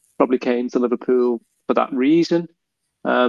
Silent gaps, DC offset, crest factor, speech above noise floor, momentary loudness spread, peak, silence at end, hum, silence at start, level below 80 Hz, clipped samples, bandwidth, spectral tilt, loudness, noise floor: none; under 0.1%; 18 dB; 21 dB; 8 LU; 0 dBFS; 0 s; none; 0.2 s; -70 dBFS; under 0.1%; 7.2 kHz; -6.5 dB/octave; -20 LUFS; -40 dBFS